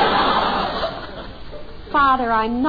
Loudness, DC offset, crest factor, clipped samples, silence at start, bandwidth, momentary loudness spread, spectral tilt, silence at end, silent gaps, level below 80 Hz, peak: -19 LUFS; under 0.1%; 14 dB; under 0.1%; 0 s; 5 kHz; 21 LU; -6.5 dB/octave; 0 s; none; -38 dBFS; -6 dBFS